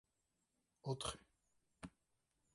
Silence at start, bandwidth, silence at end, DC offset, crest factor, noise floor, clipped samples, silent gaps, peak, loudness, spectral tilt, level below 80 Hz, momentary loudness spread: 0.85 s; 11.5 kHz; 0.65 s; under 0.1%; 24 dB; -87 dBFS; under 0.1%; none; -30 dBFS; -47 LUFS; -4 dB/octave; -70 dBFS; 15 LU